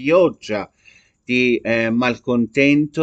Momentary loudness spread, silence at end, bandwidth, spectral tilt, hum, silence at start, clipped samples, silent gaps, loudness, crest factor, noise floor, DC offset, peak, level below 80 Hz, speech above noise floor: 11 LU; 0 s; 8 kHz; -6 dB/octave; none; 0 s; under 0.1%; none; -18 LUFS; 16 dB; -52 dBFS; under 0.1%; -2 dBFS; -54 dBFS; 35 dB